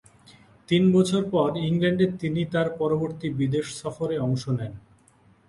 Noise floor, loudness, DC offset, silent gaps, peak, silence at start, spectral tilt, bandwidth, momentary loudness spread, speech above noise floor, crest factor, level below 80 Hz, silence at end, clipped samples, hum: -58 dBFS; -25 LUFS; under 0.1%; none; -8 dBFS; 0.7 s; -6.5 dB/octave; 11.5 kHz; 10 LU; 35 dB; 18 dB; -58 dBFS; 0.7 s; under 0.1%; none